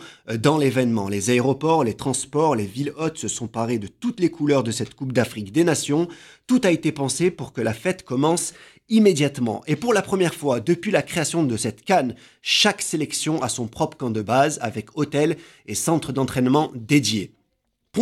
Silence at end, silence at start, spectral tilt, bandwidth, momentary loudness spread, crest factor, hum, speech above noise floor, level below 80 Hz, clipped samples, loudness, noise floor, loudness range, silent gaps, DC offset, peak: 0 s; 0 s; -4.5 dB/octave; 16 kHz; 8 LU; 18 dB; none; 51 dB; -58 dBFS; under 0.1%; -22 LUFS; -73 dBFS; 2 LU; none; under 0.1%; -4 dBFS